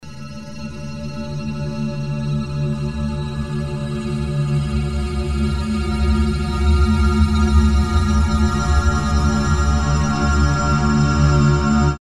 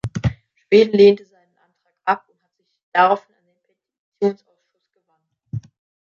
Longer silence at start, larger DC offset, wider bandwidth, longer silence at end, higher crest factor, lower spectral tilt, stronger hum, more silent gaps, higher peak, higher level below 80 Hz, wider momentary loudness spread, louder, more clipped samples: about the same, 0 s vs 0.05 s; first, 1% vs under 0.1%; first, 10.5 kHz vs 7.2 kHz; second, 0.05 s vs 0.45 s; about the same, 14 dB vs 18 dB; about the same, -6.5 dB/octave vs -7 dB/octave; neither; second, none vs 2.83-2.92 s, 3.98-4.12 s; about the same, -2 dBFS vs -2 dBFS; first, -22 dBFS vs -48 dBFS; second, 11 LU vs 20 LU; about the same, -19 LUFS vs -18 LUFS; neither